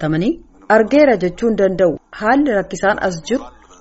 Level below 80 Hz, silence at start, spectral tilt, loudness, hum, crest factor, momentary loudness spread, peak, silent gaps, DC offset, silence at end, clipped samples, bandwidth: -42 dBFS; 0 s; -5 dB/octave; -16 LUFS; none; 14 dB; 9 LU; 0 dBFS; none; under 0.1%; 0.3 s; under 0.1%; 8 kHz